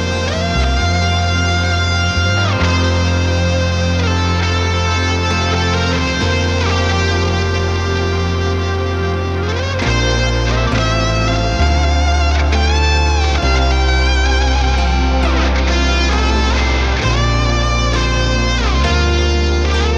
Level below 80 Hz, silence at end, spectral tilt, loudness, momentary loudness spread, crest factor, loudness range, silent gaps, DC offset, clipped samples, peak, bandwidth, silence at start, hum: -18 dBFS; 0 s; -5 dB/octave; -15 LUFS; 3 LU; 12 dB; 2 LU; none; under 0.1%; under 0.1%; -2 dBFS; 8.4 kHz; 0 s; none